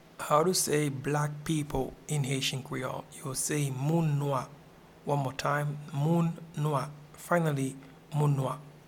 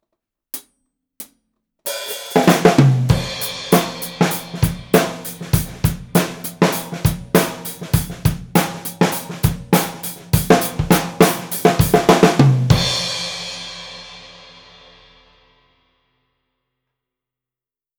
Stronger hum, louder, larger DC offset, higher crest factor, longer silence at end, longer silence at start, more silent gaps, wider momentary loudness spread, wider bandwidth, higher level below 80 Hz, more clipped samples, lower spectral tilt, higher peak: neither; second, -31 LUFS vs -17 LUFS; neither; about the same, 20 dB vs 18 dB; second, 0.1 s vs 3.65 s; second, 0.2 s vs 0.55 s; neither; second, 10 LU vs 17 LU; second, 17.5 kHz vs over 20 kHz; second, -56 dBFS vs -36 dBFS; neither; about the same, -5 dB/octave vs -5 dB/octave; second, -12 dBFS vs 0 dBFS